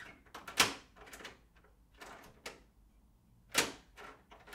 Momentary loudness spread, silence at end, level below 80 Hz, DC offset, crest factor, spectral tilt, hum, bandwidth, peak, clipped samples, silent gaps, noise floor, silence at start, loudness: 23 LU; 0 s; -66 dBFS; under 0.1%; 30 dB; -0.5 dB/octave; none; 16 kHz; -12 dBFS; under 0.1%; none; -66 dBFS; 0 s; -33 LUFS